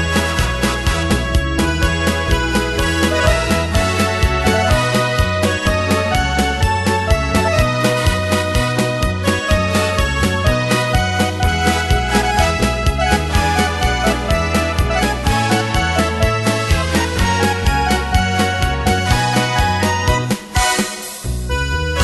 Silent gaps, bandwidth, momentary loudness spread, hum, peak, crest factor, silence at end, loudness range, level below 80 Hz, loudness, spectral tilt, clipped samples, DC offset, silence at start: none; 12.5 kHz; 2 LU; none; 0 dBFS; 16 dB; 0 s; 1 LU; -22 dBFS; -16 LUFS; -4.5 dB/octave; under 0.1%; under 0.1%; 0 s